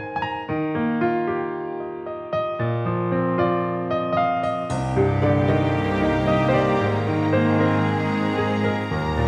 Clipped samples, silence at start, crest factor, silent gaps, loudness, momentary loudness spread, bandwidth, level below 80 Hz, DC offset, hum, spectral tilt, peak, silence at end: under 0.1%; 0 s; 14 dB; none; -22 LUFS; 7 LU; 10.5 kHz; -42 dBFS; under 0.1%; none; -8 dB/octave; -6 dBFS; 0 s